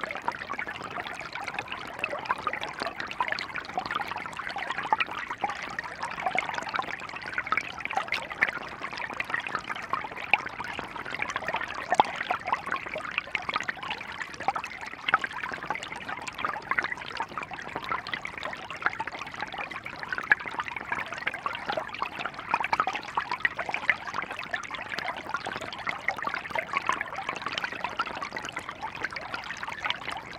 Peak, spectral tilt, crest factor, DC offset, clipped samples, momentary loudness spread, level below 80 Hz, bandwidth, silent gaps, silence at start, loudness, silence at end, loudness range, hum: -2 dBFS; -2.5 dB/octave; 30 dB; under 0.1%; under 0.1%; 8 LU; -62 dBFS; 17.5 kHz; none; 0 s; -31 LUFS; 0 s; 3 LU; none